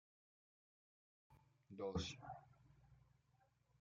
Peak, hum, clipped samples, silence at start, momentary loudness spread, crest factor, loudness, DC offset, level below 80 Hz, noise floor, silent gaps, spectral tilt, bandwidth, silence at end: -32 dBFS; none; under 0.1%; 1.3 s; 14 LU; 24 dB; -49 LUFS; under 0.1%; -72 dBFS; -79 dBFS; none; -5 dB/octave; 7 kHz; 0.8 s